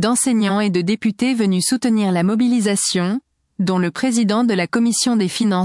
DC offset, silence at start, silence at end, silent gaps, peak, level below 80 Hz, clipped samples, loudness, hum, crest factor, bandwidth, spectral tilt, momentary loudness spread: under 0.1%; 0 s; 0 s; none; -6 dBFS; -64 dBFS; under 0.1%; -17 LUFS; none; 12 dB; 12 kHz; -4.5 dB/octave; 4 LU